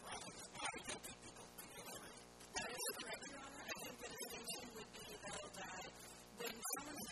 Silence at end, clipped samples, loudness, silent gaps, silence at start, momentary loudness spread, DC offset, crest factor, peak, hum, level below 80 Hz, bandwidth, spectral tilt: 0 s; under 0.1%; -49 LUFS; none; 0 s; 10 LU; under 0.1%; 22 dB; -30 dBFS; 60 Hz at -70 dBFS; -72 dBFS; 13.5 kHz; -1.5 dB/octave